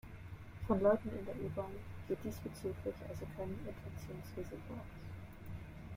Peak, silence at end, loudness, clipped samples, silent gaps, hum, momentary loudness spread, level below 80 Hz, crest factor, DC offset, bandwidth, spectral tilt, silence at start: -20 dBFS; 0 s; -42 LUFS; under 0.1%; none; none; 17 LU; -56 dBFS; 22 dB; under 0.1%; 16.5 kHz; -7.5 dB/octave; 0.05 s